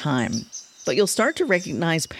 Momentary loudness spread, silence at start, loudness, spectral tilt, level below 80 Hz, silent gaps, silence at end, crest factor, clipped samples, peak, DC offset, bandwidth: 10 LU; 0 s; -22 LUFS; -4 dB/octave; -58 dBFS; none; 0 s; 18 dB; under 0.1%; -4 dBFS; under 0.1%; 16 kHz